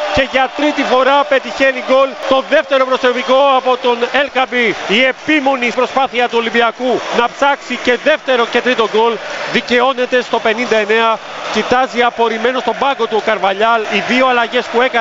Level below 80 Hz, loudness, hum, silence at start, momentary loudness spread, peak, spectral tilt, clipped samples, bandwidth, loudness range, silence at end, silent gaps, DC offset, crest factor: -48 dBFS; -13 LUFS; none; 0 s; 4 LU; 0 dBFS; -3.5 dB/octave; under 0.1%; 7.8 kHz; 2 LU; 0 s; none; under 0.1%; 14 dB